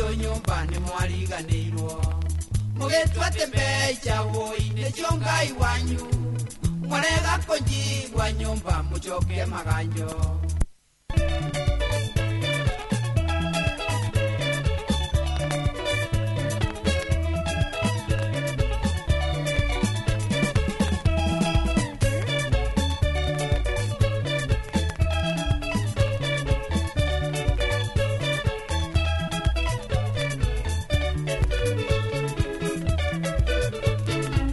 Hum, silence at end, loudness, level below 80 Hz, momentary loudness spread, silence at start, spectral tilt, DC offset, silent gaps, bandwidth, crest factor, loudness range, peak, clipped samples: none; 0 s; -26 LUFS; -30 dBFS; 4 LU; 0 s; -5 dB/octave; under 0.1%; none; 12 kHz; 18 dB; 2 LU; -6 dBFS; under 0.1%